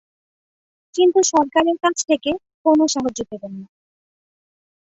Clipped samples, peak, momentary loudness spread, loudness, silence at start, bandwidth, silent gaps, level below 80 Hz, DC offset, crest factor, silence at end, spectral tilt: under 0.1%; -4 dBFS; 15 LU; -18 LUFS; 0.95 s; 8.2 kHz; 2.54-2.65 s; -60 dBFS; under 0.1%; 18 dB; 1.3 s; -3 dB/octave